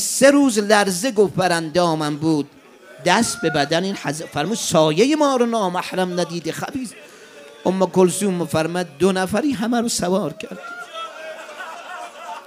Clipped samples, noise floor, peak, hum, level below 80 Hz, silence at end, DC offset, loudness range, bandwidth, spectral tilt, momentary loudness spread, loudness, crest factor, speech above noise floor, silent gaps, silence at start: under 0.1%; -42 dBFS; 0 dBFS; none; -58 dBFS; 0 s; under 0.1%; 3 LU; 16 kHz; -4.5 dB/octave; 17 LU; -19 LUFS; 20 dB; 23 dB; none; 0 s